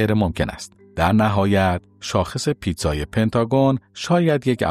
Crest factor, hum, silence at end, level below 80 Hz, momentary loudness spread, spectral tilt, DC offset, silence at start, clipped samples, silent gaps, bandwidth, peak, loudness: 14 dB; none; 0 s; -38 dBFS; 8 LU; -6 dB/octave; under 0.1%; 0 s; under 0.1%; none; 15 kHz; -4 dBFS; -20 LUFS